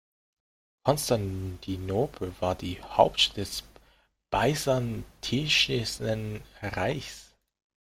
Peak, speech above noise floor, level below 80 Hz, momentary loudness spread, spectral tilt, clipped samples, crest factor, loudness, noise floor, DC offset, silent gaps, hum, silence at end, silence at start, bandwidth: -6 dBFS; 36 dB; -50 dBFS; 13 LU; -4 dB/octave; under 0.1%; 24 dB; -28 LUFS; -64 dBFS; under 0.1%; none; none; 0.65 s; 0.85 s; 16.5 kHz